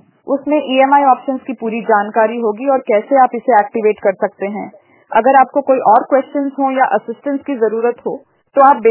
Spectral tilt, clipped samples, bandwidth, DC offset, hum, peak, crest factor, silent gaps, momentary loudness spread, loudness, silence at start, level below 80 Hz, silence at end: -9 dB/octave; under 0.1%; 4 kHz; under 0.1%; none; 0 dBFS; 14 dB; none; 11 LU; -14 LUFS; 0.25 s; -66 dBFS; 0 s